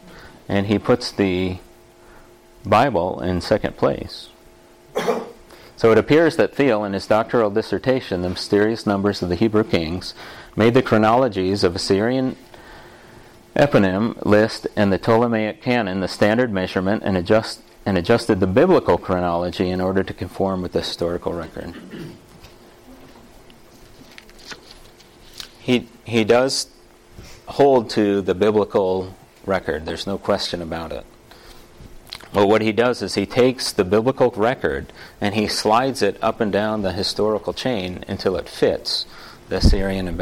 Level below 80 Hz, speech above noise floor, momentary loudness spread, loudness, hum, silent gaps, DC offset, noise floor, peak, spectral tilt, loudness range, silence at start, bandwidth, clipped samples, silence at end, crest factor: -38 dBFS; 29 dB; 15 LU; -20 LUFS; none; none; under 0.1%; -48 dBFS; -6 dBFS; -5.5 dB/octave; 6 LU; 0.05 s; 16.5 kHz; under 0.1%; 0 s; 14 dB